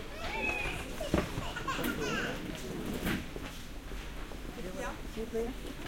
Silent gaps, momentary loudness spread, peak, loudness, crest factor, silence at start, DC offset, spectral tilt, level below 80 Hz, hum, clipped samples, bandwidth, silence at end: none; 11 LU; -14 dBFS; -37 LUFS; 22 dB; 0 s; under 0.1%; -4.5 dB/octave; -44 dBFS; none; under 0.1%; 16.5 kHz; 0 s